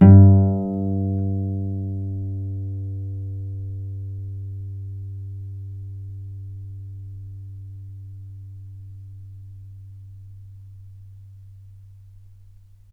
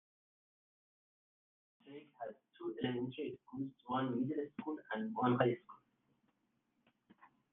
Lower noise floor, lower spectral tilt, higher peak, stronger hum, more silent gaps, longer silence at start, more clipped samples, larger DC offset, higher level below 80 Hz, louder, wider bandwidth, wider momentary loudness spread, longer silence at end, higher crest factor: second, -48 dBFS vs -82 dBFS; first, -13 dB/octave vs -5.5 dB/octave; first, 0 dBFS vs -18 dBFS; neither; neither; second, 0 s vs 1.85 s; neither; neither; first, -52 dBFS vs -84 dBFS; first, -23 LUFS vs -40 LUFS; second, 2.1 kHz vs 3.9 kHz; first, 20 LU vs 16 LU; first, 0.8 s vs 0.25 s; about the same, 22 dB vs 26 dB